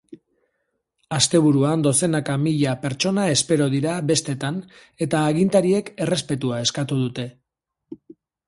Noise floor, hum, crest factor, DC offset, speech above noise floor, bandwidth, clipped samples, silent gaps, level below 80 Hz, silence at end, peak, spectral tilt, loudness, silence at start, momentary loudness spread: -80 dBFS; none; 18 dB; under 0.1%; 60 dB; 11.5 kHz; under 0.1%; none; -58 dBFS; 0.55 s; -4 dBFS; -4.5 dB/octave; -21 LUFS; 0.1 s; 9 LU